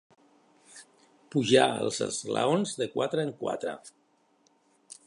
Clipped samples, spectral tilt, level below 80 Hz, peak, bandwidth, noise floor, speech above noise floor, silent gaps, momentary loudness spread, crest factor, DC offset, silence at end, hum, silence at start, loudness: under 0.1%; -4 dB/octave; -74 dBFS; -8 dBFS; 11.5 kHz; -67 dBFS; 40 dB; none; 13 LU; 22 dB; under 0.1%; 0.15 s; none; 0.75 s; -28 LUFS